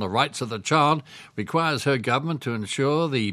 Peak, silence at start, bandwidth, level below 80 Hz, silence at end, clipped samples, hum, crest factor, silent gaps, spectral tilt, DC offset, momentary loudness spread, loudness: -4 dBFS; 0 s; 14 kHz; -66 dBFS; 0 s; under 0.1%; none; 20 dB; none; -5 dB/octave; under 0.1%; 8 LU; -24 LUFS